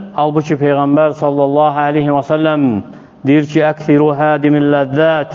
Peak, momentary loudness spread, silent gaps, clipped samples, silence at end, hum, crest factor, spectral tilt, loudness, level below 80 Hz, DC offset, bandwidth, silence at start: 0 dBFS; 3 LU; none; under 0.1%; 0 s; none; 12 dB; -8 dB/octave; -13 LUFS; -56 dBFS; under 0.1%; 7 kHz; 0 s